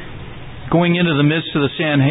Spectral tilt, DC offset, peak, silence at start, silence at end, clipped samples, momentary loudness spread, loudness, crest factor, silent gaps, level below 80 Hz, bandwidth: -12 dB/octave; under 0.1%; -2 dBFS; 0 s; 0 s; under 0.1%; 19 LU; -16 LUFS; 14 dB; none; -42 dBFS; 4 kHz